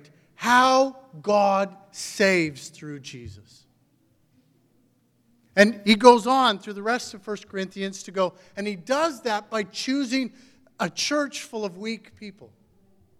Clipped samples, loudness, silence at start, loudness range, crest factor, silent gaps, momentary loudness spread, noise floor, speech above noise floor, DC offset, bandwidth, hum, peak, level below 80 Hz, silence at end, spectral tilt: under 0.1%; -23 LUFS; 0.4 s; 8 LU; 24 dB; none; 20 LU; -65 dBFS; 41 dB; under 0.1%; 15.5 kHz; none; 0 dBFS; -66 dBFS; 0.75 s; -4 dB/octave